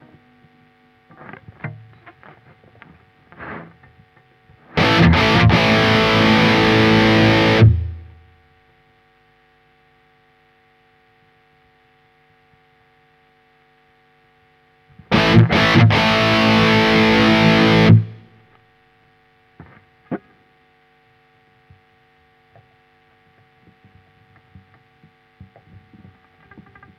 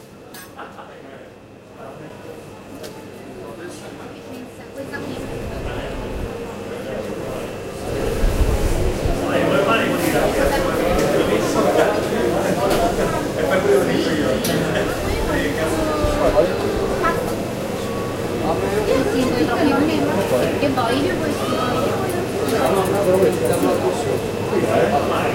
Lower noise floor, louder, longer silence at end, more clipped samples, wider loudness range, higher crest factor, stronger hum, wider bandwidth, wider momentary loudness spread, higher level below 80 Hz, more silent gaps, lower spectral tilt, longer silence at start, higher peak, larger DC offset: first, -56 dBFS vs -41 dBFS; first, -13 LUFS vs -20 LUFS; first, 6.8 s vs 0 s; neither; second, 9 LU vs 15 LU; about the same, 18 dB vs 18 dB; neither; second, 11 kHz vs 16 kHz; first, 22 LU vs 18 LU; second, -38 dBFS vs -32 dBFS; neither; about the same, -6.5 dB/octave vs -5.5 dB/octave; first, 1.65 s vs 0 s; about the same, 0 dBFS vs -2 dBFS; neither